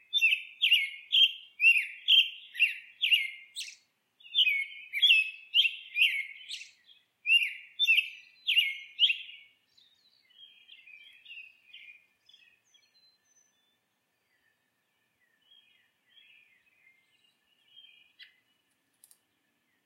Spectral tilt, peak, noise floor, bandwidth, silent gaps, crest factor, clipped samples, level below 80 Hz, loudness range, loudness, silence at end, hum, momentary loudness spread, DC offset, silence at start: 6 dB/octave; -10 dBFS; -78 dBFS; 16 kHz; none; 22 dB; under 0.1%; under -90 dBFS; 7 LU; -25 LUFS; 1.6 s; none; 19 LU; under 0.1%; 0.15 s